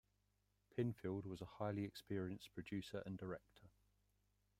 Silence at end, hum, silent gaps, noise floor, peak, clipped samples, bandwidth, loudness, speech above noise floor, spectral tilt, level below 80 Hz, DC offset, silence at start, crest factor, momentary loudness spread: 0.9 s; 50 Hz at -65 dBFS; none; -83 dBFS; -28 dBFS; under 0.1%; 16 kHz; -48 LUFS; 36 dB; -7 dB/octave; -76 dBFS; under 0.1%; 0.75 s; 20 dB; 8 LU